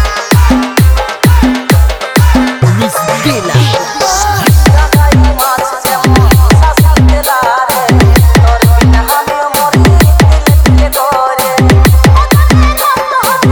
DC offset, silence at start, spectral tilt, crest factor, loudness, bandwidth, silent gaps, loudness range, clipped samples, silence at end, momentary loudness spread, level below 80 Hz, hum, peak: under 0.1%; 0 s; -5.5 dB/octave; 6 dB; -8 LUFS; over 20 kHz; none; 2 LU; 4%; 0 s; 5 LU; -10 dBFS; none; 0 dBFS